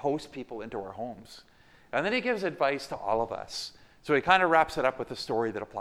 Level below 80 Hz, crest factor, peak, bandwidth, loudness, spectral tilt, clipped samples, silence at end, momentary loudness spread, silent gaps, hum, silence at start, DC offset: -60 dBFS; 24 dB; -6 dBFS; 15 kHz; -29 LUFS; -4.5 dB/octave; under 0.1%; 0 s; 17 LU; none; none; 0 s; under 0.1%